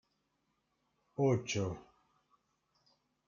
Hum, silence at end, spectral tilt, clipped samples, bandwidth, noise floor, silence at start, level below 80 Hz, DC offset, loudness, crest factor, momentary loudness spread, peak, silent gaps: none; 1.45 s; -5.5 dB/octave; under 0.1%; 7.4 kHz; -81 dBFS; 1.2 s; -72 dBFS; under 0.1%; -35 LUFS; 22 dB; 16 LU; -20 dBFS; none